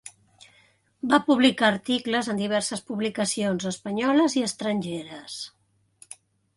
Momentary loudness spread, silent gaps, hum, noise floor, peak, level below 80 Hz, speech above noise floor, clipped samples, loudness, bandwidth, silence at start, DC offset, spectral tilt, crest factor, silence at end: 19 LU; none; none; -62 dBFS; -6 dBFS; -68 dBFS; 37 dB; under 0.1%; -24 LUFS; 11.5 kHz; 0.05 s; under 0.1%; -4 dB/octave; 20 dB; 1.1 s